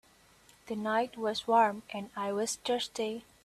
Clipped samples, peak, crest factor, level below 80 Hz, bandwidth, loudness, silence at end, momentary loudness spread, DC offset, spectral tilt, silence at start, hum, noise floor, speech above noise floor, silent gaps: under 0.1%; -14 dBFS; 18 dB; -72 dBFS; 14.5 kHz; -32 LUFS; 0.25 s; 12 LU; under 0.1%; -3 dB/octave; 0.65 s; none; -62 dBFS; 30 dB; none